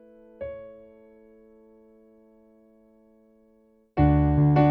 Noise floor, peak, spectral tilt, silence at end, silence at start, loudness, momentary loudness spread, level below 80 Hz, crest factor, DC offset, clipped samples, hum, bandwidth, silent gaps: -61 dBFS; -8 dBFS; -11.5 dB/octave; 0 s; 0.4 s; -23 LUFS; 22 LU; -38 dBFS; 18 dB; under 0.1%; under 0.1%; none; 4.5 kHz; none